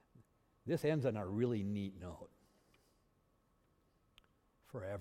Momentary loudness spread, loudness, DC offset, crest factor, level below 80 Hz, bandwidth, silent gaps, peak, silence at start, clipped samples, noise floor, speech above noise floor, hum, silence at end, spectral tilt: 16 LU; -39 LUFS; under 0.1%; 20 dB; -74 dBFS; 15.5 kHz; none; -24 dBFS; 0.15 s; under 0.1%; -76 dBFS; 37 dB; none; 0 s; -8 dB/octave